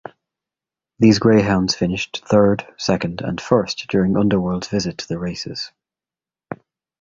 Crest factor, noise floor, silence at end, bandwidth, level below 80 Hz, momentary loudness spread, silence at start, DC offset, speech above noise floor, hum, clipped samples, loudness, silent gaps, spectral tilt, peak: 18 dB; under -90 dBFS; 0.45 s; 7.8 kHz; -46 dBFS; 15 LU; 1 s; under 0.1%; over 72 dB; none; under 0.1%; -19 LUFS; none; -6 dB/octave; -2 dBFS